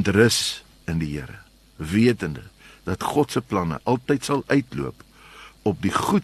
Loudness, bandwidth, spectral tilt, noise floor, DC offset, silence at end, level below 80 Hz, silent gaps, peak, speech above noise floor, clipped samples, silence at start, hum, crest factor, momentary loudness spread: -23 LUFS; 13 kHz; -5 dB/octave; -46 dBFS; under 0.1%; 0 s; -48 dBFS; none; -2 dBFS; 24 dB; under 0.1%; 0 s; none; 20 dB; 16 LU